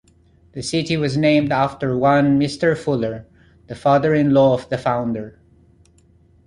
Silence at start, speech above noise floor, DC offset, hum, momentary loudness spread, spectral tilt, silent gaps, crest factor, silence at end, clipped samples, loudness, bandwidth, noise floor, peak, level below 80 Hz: 0.55 s; 36 dB; under 0.1%; none; 14 LU; -6.5 dB/octave; none; 16 dB; 1.15 s; under 0.1%; -18 LUFS; 11 kHz; -53 dBFS; -4 dBFS; -50 dBFS